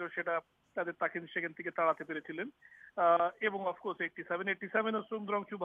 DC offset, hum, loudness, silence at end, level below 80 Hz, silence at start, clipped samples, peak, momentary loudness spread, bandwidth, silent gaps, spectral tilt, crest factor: under 0.1%; none; -35 LUFS; 0 s; -82 dBFS; 0 s; under 0.1%; -16 dBFS; 11 LU; 3.8 kHz; none; -7.5 dB/octave; 20 dB